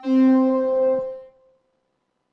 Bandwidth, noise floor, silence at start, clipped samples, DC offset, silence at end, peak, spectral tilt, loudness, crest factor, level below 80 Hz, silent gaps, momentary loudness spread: 5.6 kHz; -73 dBFS; 0 s; under 0.1%; under 0.1%; 1.1 s; -10 dBFS; -7.5 dB/octave; -19 LUFS; 12 dB; -66 dBFS; none; 16 LU